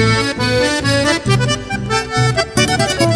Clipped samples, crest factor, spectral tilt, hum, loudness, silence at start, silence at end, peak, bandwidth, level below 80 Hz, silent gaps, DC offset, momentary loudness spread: under 0.1%; 14 dB; -4.5 dB/octave; none; -15 LUFS; 0 s; 0 s; 0 dBFS; 11 kHz; -34 dBFS; none; under 0.1%; 4 LU